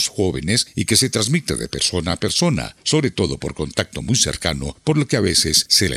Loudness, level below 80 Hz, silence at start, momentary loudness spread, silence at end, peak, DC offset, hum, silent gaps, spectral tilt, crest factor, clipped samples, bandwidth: -18 LUFS; -40 dBFS; 0 s; 9 LU; 0 s; 0 dBFS; under 0.1%; none; none; -3.5 dB/octave; 20 dB; under 0.1%; 16 kHz